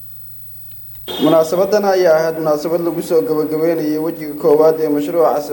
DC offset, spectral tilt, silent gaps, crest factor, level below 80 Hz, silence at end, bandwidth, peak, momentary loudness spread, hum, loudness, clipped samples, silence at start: under 0.1%; -6 dB/octave; none; 14 dB; -54 dBFS; 0 s; 18.5 kHz; -2 dBFS; 17 LU; none; -15 LUFS; under 0.1%; 0 s